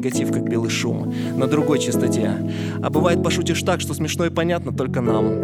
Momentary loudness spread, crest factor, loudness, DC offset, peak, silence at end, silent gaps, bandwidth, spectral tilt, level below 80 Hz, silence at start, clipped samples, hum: 5 LU; 16 dB; -21 LUFS; under 0.1%; -4 dBFS; 0 s; none; 16.5 kHz; -5.5 dB/octave; -60 dBFS; 0 s; under 0.1%; none